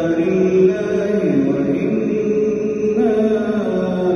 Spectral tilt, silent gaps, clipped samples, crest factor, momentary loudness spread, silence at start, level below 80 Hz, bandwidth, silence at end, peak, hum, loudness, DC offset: -8 dB/octave; none; under 0.1%; 12 dB; 4 LU; 0 s; -50 dBFS; 6.8 kHz; 0 s; -4 dBFS; none; -17 LUFS; under 0.1%